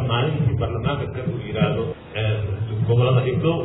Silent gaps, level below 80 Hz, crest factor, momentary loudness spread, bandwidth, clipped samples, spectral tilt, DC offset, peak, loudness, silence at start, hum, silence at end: none; -42 dBFS; 14 dB; 8 LU; 4 kHz; under 0.1%; -6.5 dB/octave; under 0.1%; -6 dBFS; -22 LUFS; 0 s; none; 0 s